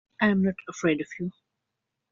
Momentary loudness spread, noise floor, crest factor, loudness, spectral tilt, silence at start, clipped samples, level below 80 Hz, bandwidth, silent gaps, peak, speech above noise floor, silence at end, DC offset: 12 LU; -84 dBFS; 22 dB; -27 LUFS; -5.5 dB/octave; 0.2 s; under 0.1%; -66 dBFS; 7.4 kHz; none; -6 dBFS; 57 dB; 0.8 s; under 0.1%